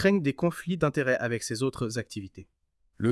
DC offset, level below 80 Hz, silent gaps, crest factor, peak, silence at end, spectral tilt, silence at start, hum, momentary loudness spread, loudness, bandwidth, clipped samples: under 0.1%; -58 dBFS; none; 18 dB; -12 dBFS; 0 s; -6 dB/octave; 0 s; none; 12 LU; -28 LUFS; 12 kHz; under 0.1%